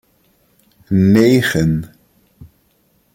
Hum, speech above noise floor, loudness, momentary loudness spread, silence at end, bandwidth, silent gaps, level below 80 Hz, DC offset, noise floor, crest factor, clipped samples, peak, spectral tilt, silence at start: none; 46 dB; -14 LUFS; 11 LU; 0.7 s; 16.5 kHz; none; -44 dBFS; under 0.1%; -59 dBFS; 16 dB; under 0.1%; -2 dBFS; -6.5 dB/octave; 0.9 s